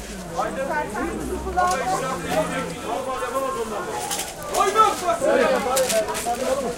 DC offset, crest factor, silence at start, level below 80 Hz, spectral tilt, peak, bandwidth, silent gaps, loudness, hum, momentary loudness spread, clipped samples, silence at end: under 0.1%; 18 dB; 0 s; -44 dBFS; -3 dB/octave; -6 dBFS; 17 kHz; none; -23 LUFS; none; 9 LU; under 0.1%; 0 s